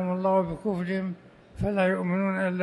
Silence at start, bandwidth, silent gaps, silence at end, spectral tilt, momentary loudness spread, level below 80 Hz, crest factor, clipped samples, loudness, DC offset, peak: 0 s; 10 kHz; none; 0 s; -8.5 dB/octave; 8 LU; -50 dBFS; 14 dB; under 0.1%; -27 LUFS; under 0.1%; -12 dBFS